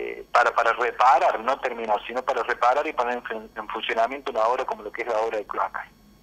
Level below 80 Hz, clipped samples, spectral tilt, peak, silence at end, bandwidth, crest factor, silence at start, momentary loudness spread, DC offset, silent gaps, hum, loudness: -60 dBFS; under 0.1%; -2.5 dB/octave; -4 dBFS; 0.35 s; 15 kHz; 20 dB; 0 s; 12 LU; under 0.1%; none; none; -24 LUFS